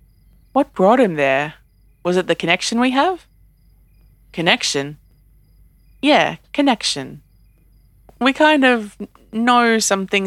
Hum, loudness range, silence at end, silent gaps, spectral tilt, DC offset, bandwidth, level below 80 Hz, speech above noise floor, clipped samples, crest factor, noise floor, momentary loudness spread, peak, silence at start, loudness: none; 3 LU; 0 s; none; -3.5 dB/octave; under 0.1%; 14.5 kHz; -52 dBFS; 35 dB; under 0.1%; 18 dB; -52 dBFS; 14 LU; 0 dBFS; 0.55 s; -17 LUFS